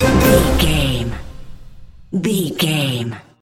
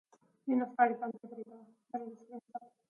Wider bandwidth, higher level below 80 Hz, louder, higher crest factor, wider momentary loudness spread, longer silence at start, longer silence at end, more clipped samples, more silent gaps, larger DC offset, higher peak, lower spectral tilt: first, 17 kHz vs 3.4 kHz; first, -26 dBFS vs under -90 dBFS; first, -17 LUFS vs -35 LUFS; second, 18 dB vs 24 dB; second, 14 LU vs 19 LU; second, 0 s vs 0.45 s; about the same, 0.2 s vs 0.3 s; neither; neither; neither; first, 0 dBFS vs -14 dBFS; second, -5 dB/octave vs -8 dB/octave